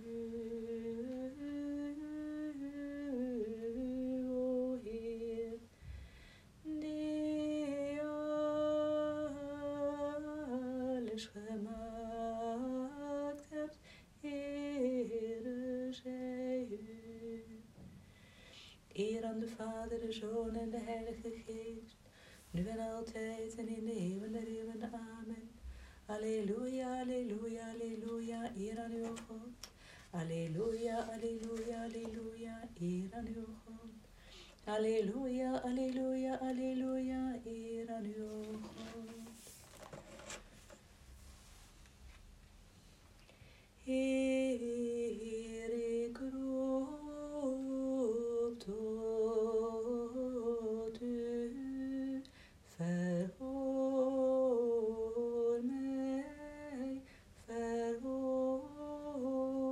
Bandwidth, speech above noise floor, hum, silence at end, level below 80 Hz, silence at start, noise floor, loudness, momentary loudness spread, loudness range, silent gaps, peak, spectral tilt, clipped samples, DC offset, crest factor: 13.5 kHz; 22 dB; none; 0 s; -64 dBFS; 0 s; -62 dBFS; -41 LUFS; 18 LU; 7 LU; none; -26 dBFS; -6.5 dB/octave; under 0.1%; under 0.1%; 16 dB